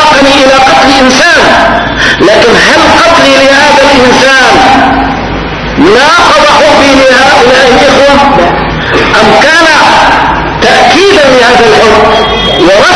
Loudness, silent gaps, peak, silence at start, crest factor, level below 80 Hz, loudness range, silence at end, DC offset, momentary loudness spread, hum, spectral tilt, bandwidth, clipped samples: -2 LUFS; none; 0 dBFS; 0 s; 2 dB; -24 dBFS; 1 LU; 0 s; under 0.1%; 5 LU; none; -3.5 dB/octave; 11 kHz; 20%